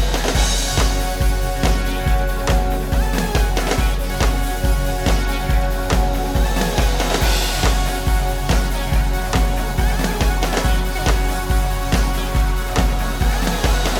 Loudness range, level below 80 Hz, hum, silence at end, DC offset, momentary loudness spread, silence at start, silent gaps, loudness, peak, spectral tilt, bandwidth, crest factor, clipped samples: 1 LU; -18 dBFS; none; 0 s; under 0.1%; 3 LU; 0 s; none; -19 LUFS; -2 dBFS; -4.5 dB/octave; 18.5 kHz; 14 dB; under 0.1%